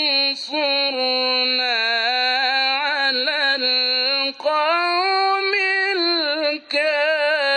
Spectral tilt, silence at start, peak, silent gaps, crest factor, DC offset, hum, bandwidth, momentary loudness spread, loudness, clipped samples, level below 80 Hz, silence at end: -0.5 dB/octave; 0 s; -6 dBFS; none; 12 dB; under 0.1%; none; 9.4 kHz; 3 LU; -18 LUFS; under 0.1%; -80 dBFS; 0 s